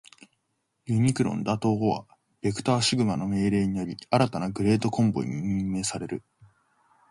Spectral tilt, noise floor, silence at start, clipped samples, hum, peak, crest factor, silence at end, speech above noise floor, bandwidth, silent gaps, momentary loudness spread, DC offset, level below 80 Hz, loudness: -5.5 dB/octave; -76 dBFS; 0.85 s; under 0.1%; none; -8 dBFS; 20 dB; 0.65 s; 51 dB; 11.5 kHz; none; 9 LU; under 0.1%; -54 dBFS; -26 LUFS